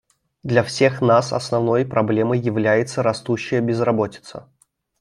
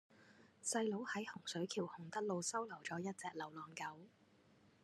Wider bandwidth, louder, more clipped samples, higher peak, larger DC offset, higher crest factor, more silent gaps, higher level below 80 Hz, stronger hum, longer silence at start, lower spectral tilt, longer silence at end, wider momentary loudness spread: about the same, 12 kHz vs 13 kHz; first, -19 LUFS vs -44 LUFS; neither; first, -2 dBFS vs -26 dBFS; neither; about the same, 18 dB vs 20 dB; neither; first, -60 dBFS vs under -90 dBFS; neither; first, 0.45 s vs 0.1 s; first, -6 dB/octave vs -3.5 dB/octave; second, 0.6 s vs 0.75 s; about the same, 9 LU vs 9 LU